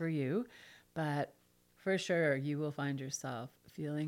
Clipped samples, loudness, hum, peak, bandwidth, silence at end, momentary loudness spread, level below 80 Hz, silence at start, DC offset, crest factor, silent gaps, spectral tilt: under 0.1%; -37 LUFS; none; -20 dBFS; 16.5 kHz; 0 s; 14 LU; -78 dBFS; 0 s; under 0.1%; 18 dB; none; -5.5 dB/octave